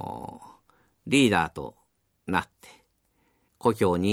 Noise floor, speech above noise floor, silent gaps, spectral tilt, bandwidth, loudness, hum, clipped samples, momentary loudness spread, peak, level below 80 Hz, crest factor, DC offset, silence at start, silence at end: -70 dBFS; 45 dB; none; -5 dB/octave; 16 kHz; -25 LUFS; none; under 0.1%; 23 LU; -8 dBFS; -58 dBFS; 20 dB; under 0.1%; 0 s; 0 s